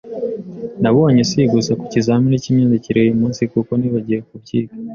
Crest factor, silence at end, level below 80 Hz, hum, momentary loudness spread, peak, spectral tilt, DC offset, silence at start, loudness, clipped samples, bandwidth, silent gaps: 14 dB; 0 s; -50 dBFS; none; 10 LU; -2 dBFS; -7 dB/octave; under 0.1%; 0.05 s; -16 LUFS; under 0.1%; 7.2 kHz; none